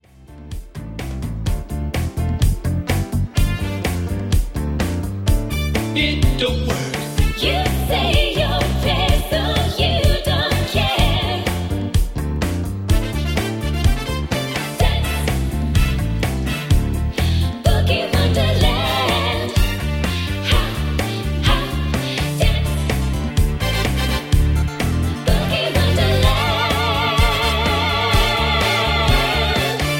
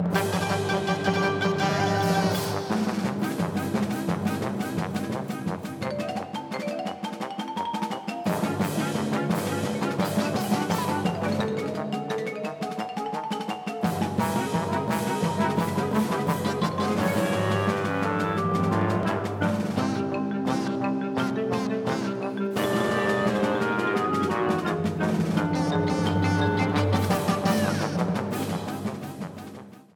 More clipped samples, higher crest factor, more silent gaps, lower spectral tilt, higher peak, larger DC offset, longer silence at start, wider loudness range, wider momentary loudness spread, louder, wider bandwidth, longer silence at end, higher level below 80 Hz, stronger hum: neither; about the same, 16 dB vs 18 dB; neither; about the same, -5 dB/octave vs -6 dB/octave; first, -2 dBFS vs -8 dBFS; neither; first, 0.2 s vs 0 s; about the same, 5 LU vs 5 LU; about the same, 6 LU vs 7 LU; first, -19 LUFS vs -26 LUFS; second, 17 kHz vs 19.5 kHz; second, 0 s vs 0.15 s; first, -22 dBFS vs -58 dBFS; neither